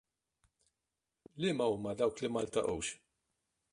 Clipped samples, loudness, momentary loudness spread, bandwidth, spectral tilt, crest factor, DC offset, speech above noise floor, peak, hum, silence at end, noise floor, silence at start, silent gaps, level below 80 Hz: under 0.1%; -36 LUFS; 7 LU; 11.5 kHz; -4.5 dB/octave; 20 dB; under 0.1%; 54 dB; -18 dBFS; none; 0.75 s; -89 dBFS; 1.35 s; none; -66 dBFS